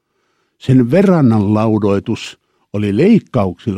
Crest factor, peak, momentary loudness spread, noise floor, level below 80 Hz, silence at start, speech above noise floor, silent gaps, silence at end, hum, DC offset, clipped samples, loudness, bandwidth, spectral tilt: 12 dB; 0 dBFS; 13 LU; -64 dBFS; -50 dBFS; 0.65 s; 51 dB; none; 0 s; none; under 0.1%; under 0.1%; -13 LUFS; 11 kHz; -8.5 dB/octave